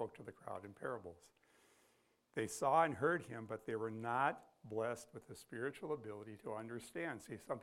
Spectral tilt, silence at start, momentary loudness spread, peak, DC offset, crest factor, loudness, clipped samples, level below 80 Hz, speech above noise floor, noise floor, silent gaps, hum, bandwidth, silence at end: -5 dB/octave; 0 s; 16 LU; -20 dBFS; under 0.1%; 22 dB; -42 LUFS; under 0.1%; -82 dBFS; 34 dB; -76 dBFS; none; none; 16 kHz; 0 s